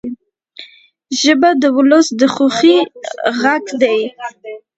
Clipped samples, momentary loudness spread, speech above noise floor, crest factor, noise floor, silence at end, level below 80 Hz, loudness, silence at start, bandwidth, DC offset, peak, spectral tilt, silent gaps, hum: under 0.1%; 18 LU; 29 dB; 14 dB; -42 dBFS; 0.2 s; -62 dBFS; -13 LUFS; 0.05 s; 8.2 kHz; under 0.1%; 0 dBFS; -3 dB/octave; none; none